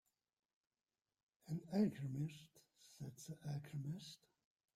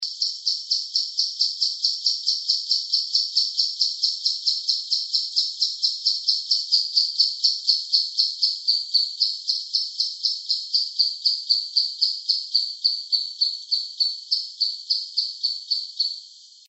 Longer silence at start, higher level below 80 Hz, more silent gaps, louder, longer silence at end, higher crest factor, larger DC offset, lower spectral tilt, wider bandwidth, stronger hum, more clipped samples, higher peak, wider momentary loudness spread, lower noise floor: first, 1.45 s vs 0 s; first, -82 dBFS vs under -90 dBFS; neither; second, -46 LUFS vs -21 LUFS; first, 0.6 s vs 0.25 s; about the same, 20 dB vs 20 dB; neither; first, -7 dB/octave vs 8.5 dB/octave; first, 15 kHz vs 8.4 kHz; neither; neither; second, -28 dBFS vs -4 dBFS; first, 19 LU vs 6 LU; first, under -90 dBFS vs -45 dBFS